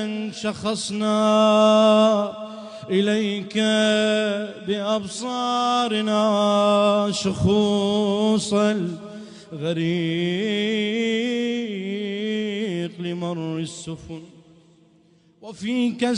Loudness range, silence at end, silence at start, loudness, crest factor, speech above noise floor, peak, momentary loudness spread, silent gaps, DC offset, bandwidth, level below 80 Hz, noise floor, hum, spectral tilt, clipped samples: 9 LU; 0 s; 0 s; -21 LUFS; 16 dB; 36 dB; -6 dBFS; 13 LU; none; under 0.1%; 10.5 kHz; -58 dBFS; -57 dBFS; none; -5 dB/octave; under 0.1%